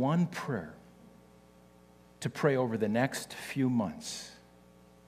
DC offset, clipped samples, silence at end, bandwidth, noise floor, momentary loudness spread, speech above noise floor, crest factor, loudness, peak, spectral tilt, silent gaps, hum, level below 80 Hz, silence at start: under 0.1%; under 0.1%; 0.7 s; 15 kHz; -59 dBFS; 11 LU; 27 dB; 20 dB; -33 LUFS; -12 dBFS; -6 dB/octave; none; 60 Hz at -60 dBFS; -68 dBFS; 0 s